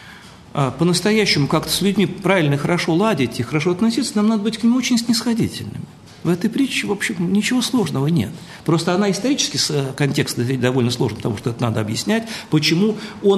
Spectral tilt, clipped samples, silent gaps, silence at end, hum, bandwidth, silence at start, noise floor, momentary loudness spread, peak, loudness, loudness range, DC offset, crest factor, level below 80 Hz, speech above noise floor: -5 dB/octave; under 0.1%; none; 0 s; none; 13 kHz; 0 s; -41 dBFS; 6 LU; -2 dBFS; -19 LUFS; 2 LU; under 0.1%; 16 dB; -52 dBFS; 22 dB